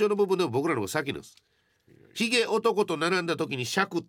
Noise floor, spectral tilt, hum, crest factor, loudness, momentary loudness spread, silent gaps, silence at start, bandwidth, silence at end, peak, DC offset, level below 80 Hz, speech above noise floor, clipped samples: -60 dBFS; -4 dB/octave; none; 18 dB; -27 LUFS; 7 LU; none; 0 s; 17.5 kHz; 0.05 s; -10 dBFS; under 0.1%; -72 dBFS; 33 dB; under 0.1%